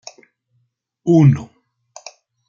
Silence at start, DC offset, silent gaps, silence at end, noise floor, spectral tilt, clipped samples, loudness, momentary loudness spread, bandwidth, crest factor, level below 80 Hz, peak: 1.05 s; under 0.1%; none; 1.05 s; -67 dBFS; -8.5 dB/octave; under 0.1%; -15 LUFS; 26 LU; 7.2 kHz; 18 dB; -56 dBFS; -2 dBFS